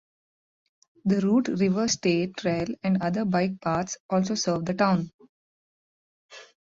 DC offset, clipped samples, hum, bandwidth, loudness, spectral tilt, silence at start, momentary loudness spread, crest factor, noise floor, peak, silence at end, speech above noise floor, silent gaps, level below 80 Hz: under 0.1%; under 0.1%; none; 7.8 kHz; -26 LUFS; -5.5 dB/octave; 1.05 s; 5 LU; 18 dB; under -90 dBFS; -10 dBFS; 0.2 s; over 65 dB; 4.00-4.09 s, 5.14-5.19 s, 5.29-6.29 s; -60 dBFS